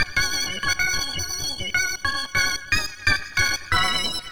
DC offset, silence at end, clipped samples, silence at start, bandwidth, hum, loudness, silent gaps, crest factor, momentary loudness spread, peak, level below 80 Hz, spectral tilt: 2%; 0 s; under 0.1%; 0 s; over 20 kHz; none; -22 LUFS; none; 18 dB; 4 LU; -6 dBFS; -40 dBFS; -1 dB/octave